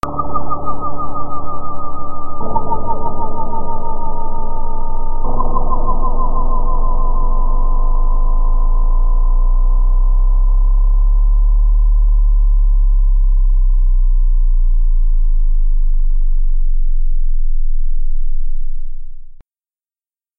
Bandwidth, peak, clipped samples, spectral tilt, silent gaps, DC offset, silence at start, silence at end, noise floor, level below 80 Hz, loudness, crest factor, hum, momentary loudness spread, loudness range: 1.4 kHz; 0 dBFS; under 0.1%; -10.5 dB/octave; none; under 0.1%; 0.05 s; 1.05 s; under -90 dBFS; -12 dBFS; -20 LUFS; 10 dB; none; 8 LU; 7 LU